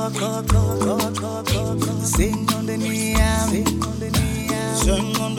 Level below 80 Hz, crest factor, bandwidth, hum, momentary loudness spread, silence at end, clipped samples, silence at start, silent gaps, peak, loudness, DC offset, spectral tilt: -28 dBFS; 16 dB; 18 kHz; none; 4 LU; 0 s; under 0.1%; 0 s; none; -6 dBFS; -21 LUFS; under 0.1%; -5 dB/octave